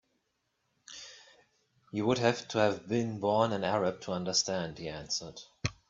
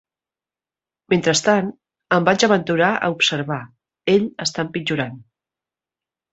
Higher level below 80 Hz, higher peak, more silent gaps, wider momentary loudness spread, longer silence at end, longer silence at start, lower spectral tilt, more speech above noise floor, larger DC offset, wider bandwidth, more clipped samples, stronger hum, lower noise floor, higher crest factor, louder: about the same, -64 dBFS vs -60 dBFS; second, -12 dBFS vs -2 dBFS; neither; first, 18 LU vs 11 LU; second, 0.15 s vs 1.1 s; second, 0.9 s vs 1.1 s; about the same, -4 dB/octave vs -4 dB/octave; second, 48 dB vs over 71 dB; neither; about the same, 7.8 kHz vs 8.2 kHz; neither; neither; second, -79 dBFS vs under -90 dBFS; about the same, 22 dB vs 20 dB; second, -31 LUFS vs -19 LUFS